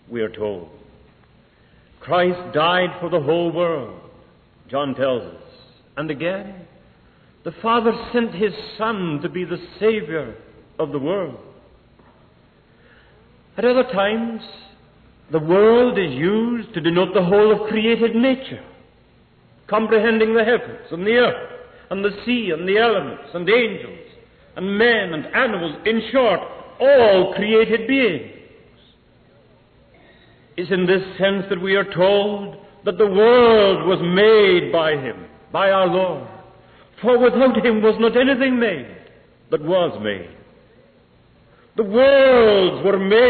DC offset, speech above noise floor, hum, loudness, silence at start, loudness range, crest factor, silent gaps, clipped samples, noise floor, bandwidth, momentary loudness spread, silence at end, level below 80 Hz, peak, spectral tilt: under 0.1%; 36 dB; none; -18 LUFS; 0.1 s; 9 LU; 14 dB; none; under 0.1%; -53 dBFS; 4.5 kHz; 16 LU; 0 s; -54 dBFS; -6 dBFS; -9.5 dB/octave